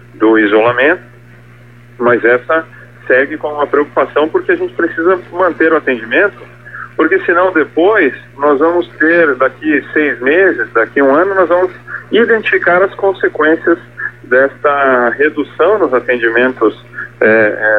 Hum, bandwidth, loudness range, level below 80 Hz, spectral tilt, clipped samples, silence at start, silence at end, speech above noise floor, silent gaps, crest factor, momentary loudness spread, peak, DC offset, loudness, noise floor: 60 Hz at -40 dBFS; 4.9 kHz; 2 LU; -52 dBFS; -7.5 dB/octave; under 0.1%; 0.15 s; 0 s; 27 dB; none; 12 dB; 6 LU; 0 dBFS; 0.4%; -11 LUFS; -38 dBFS